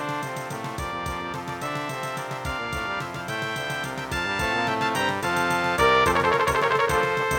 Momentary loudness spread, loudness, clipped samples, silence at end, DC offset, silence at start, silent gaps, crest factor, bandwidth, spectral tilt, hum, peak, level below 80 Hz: 11 LU; -25 LUFS; under 0.1%; 0 s; under 0.1%; 0 s; none; 18 dB; 18.5 kHz; -4 dB/octave; none; -8 dBFS; -44 dBFS